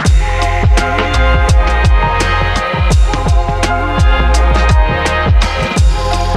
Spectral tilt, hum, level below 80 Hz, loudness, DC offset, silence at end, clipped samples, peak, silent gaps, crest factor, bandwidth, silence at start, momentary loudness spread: -5 dB/octave; none; -12 dBFS; -12 LUFS; under 0.1%; 0 s; under 0.1%; 0 dBFS; none; 10 dB; 11.5 kHz; 0 s; 3 LU